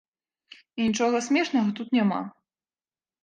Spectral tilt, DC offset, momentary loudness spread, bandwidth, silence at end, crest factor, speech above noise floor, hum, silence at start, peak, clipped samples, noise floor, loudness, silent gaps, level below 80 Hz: -5 dB/octave; under 0.1%; 11 LU; 9.6 kHz; 0.95 s; 16 dB; over 66 dB; none; 0.75 s; -12 dBFS; under 0.1%; under -90 dBFS; -25 LUFS; none; -70 dBFS